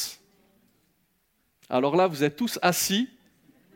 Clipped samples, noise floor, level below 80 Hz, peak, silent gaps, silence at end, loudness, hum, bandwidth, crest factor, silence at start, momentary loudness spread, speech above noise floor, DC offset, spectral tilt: under 0.1%; -71 dBFS; -70 dBFS; -6 dBFS; none; 0.7 s; -25 LUFS; none; 18 kHz; 22 dB; 0 s; 8 LU; 47 dB; under 0.1%; -3.5 dB/octave